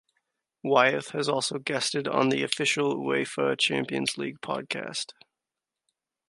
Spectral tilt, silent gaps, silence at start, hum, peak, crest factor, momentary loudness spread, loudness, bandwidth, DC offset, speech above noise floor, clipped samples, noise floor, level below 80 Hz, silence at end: -3.5 dB/octave; none; 0.65 s; none; -4 dBFS; 24 dB; 11 LU; -27 LUFS; 11.5 kHz; under 0.1%; 61 dB; under 0.1%; -89 dBFS; -74 dBFS; 1.15 s